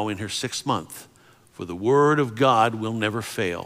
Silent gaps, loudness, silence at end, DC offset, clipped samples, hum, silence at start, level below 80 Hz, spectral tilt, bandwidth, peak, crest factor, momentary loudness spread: none; -23 LUFS; 0 s; under 0.1%; under 0.1%; none; 0 s; -66 dBFS; -5 dB/octave; 16 kHz; -6 dBFS; 18 dB; 17 LU